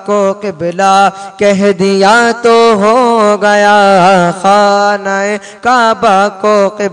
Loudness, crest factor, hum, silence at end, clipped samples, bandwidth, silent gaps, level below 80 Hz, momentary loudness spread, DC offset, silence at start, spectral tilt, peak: -8 LUFS; 8 dB; none; 0 s; 0.8%; 10.5 kHz; none; -52 dBFS; 7 LU; under 0.1%; 0 s; -4.5 dB/octave; 0 dBFS